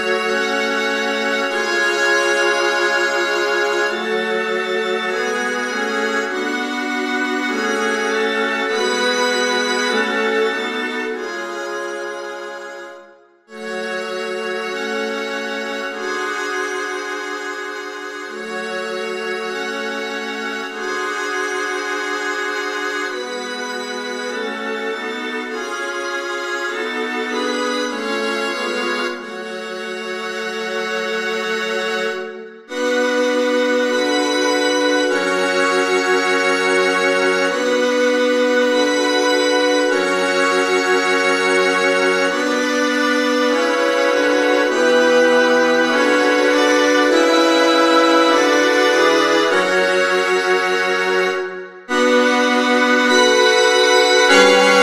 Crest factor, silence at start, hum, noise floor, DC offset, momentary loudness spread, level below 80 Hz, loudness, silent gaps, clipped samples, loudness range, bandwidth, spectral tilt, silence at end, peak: 18 dB; 0 s; none; -46 dBFS; under 0.1%; 11 LU; -68 dBFS; -17 LUFS; none; under 0.1%; 10 LU; 15.5 kHz; -2 dB/octave; 0 s; 0 dBFS